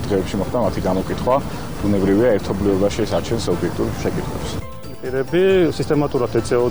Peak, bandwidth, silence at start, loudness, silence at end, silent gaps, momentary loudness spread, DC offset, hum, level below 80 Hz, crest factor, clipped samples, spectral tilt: -6 dBFS; over 20 kHz; 0 s; -20 LUFS; 0 s; none; 10 LU; 2%; none; -36 dBFS; 12 dB; under 0.1%; -6.5 dB/octave